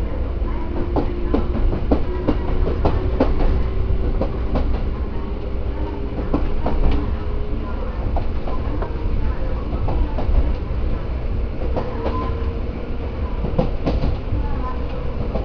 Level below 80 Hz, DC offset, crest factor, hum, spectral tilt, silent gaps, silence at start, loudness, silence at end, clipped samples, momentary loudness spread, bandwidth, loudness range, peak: -22 dBFS; under 0.1%; 18 dB; none; -9.5 dB/octave; none; 0 s; -24 LUFS; 0 s; under 0.1%; 6 LU; 5.4 kHz; 3 LU; -2 dBFS